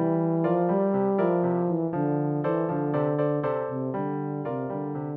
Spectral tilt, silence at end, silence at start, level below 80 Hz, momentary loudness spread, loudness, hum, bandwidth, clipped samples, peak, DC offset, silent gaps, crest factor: -12 dB/octave; 0 s; 0 s; -66 dBFS; 7 LU; -26 LUFS; none; 3.8 kHz; under 0.1%; -12 dBFS; under 0.1%; none; 14 dB